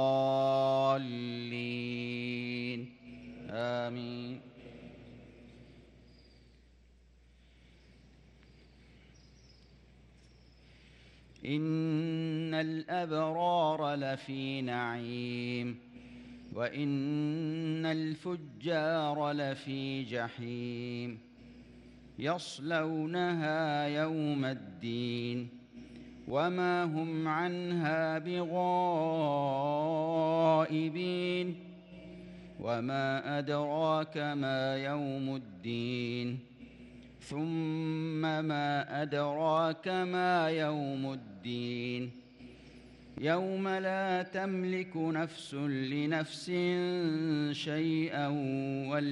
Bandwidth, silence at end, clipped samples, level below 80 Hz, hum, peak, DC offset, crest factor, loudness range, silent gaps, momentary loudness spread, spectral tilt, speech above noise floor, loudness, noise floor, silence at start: 10.5 kHz; 0 s; under 0.1%; -68 dBFS; none; -16 dBFS; under 0.1%; 18 dB; 6 LU; none; 18 LU; -7 dB/octave; 29 dB; -34 LUFS; -62 dBFS; 0 s